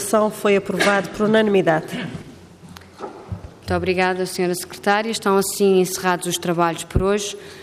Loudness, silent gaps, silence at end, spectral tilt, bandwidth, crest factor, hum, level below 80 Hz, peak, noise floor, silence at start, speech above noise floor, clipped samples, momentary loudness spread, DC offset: -19 LUFS; none; 0 s; -4.5 dB/octave; 15.5 kHz; 16 dB; none; -42 dBFS; -4 dBFS; -42 dBFS; 0 s; 23 dB; under 0.1%; 16 LU; under 0.1%